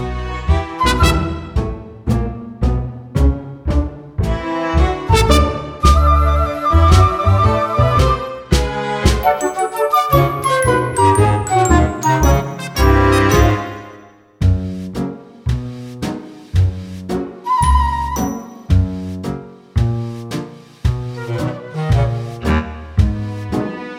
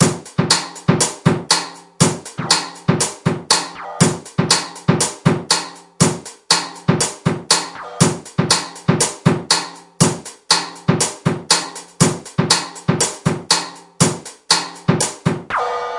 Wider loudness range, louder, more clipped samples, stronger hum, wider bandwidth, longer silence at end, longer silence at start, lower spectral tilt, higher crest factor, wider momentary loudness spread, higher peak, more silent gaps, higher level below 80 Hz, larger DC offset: first, 8 LU vs 1 LU; about the same, -17 LUFS vs -17 LUFS; neither; neither; first, 17 kHz vs 11.5 kHz; about the same, 0 s vs 0 s; about the same, 0 s vs 0 s; first, -6 dB/octave vs -3.5 dB/octave; about the same, 16 dB vs 18 dB; first, 13 LU vs 7 LU; about the same, 0 dBFS vs 0 dBFS; neither; first, -22 dBFS vs -50 dBFS; neither